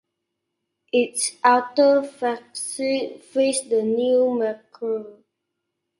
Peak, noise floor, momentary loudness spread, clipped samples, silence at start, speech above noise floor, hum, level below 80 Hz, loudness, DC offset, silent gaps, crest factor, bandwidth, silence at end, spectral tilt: -2 dBFS; -80 dBFS; 11 LU; under 0.1%; 0.95 s; 58 dB; none; -74 dBFS; -22 LUFS; under 0.1%; none; 22 dB; 11.5 kHz; 0.85 s; -2.5 dB/octave